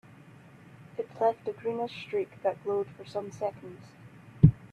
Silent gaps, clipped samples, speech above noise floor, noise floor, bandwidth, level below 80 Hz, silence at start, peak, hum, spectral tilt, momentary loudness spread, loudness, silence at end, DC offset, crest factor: none; under 0.1%; 20 dB; -53 dBFS; 8.2 kHz; -50 dBFS; 0.8 s; -6 dBFS; none; -9 dB/octave; 24 LU; -31 LUFS; 0.05 s; under 0.1%; 26 dB